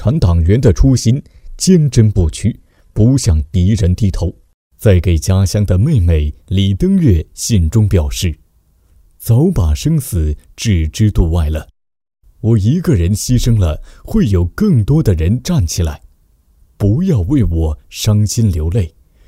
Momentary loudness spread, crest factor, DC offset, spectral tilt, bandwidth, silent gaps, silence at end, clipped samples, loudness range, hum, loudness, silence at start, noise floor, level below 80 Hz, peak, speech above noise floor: 9 LU; 12 dB; under 0.1%; -6.5 dB/octave; 16 kHz; 4.54-4.70 s; 0.4 s; under 0.1%; 3 LU; none; -14 LUFS; 0 s; -53 dBFS; -22 dBFS; 0 dBFS; 41 dB